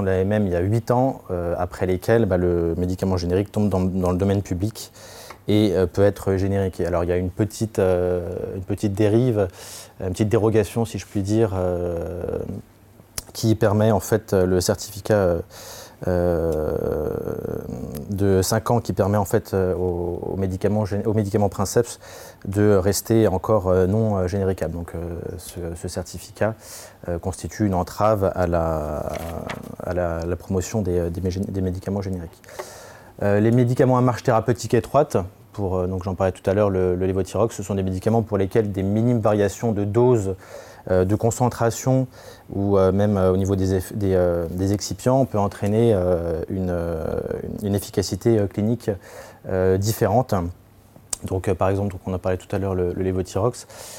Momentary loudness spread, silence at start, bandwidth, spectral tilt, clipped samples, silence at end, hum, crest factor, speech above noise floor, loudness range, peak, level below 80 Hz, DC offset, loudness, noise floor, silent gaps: 12 LU; 0 s; 17 kHz; -6.5 dB/octave; under 0.1%; 0 s; none; 16 dB; 28 dB; 4 LU; -6 dBFS; -48 dBFS; under 0.1%; -22 LUFS; -49 dBFS; none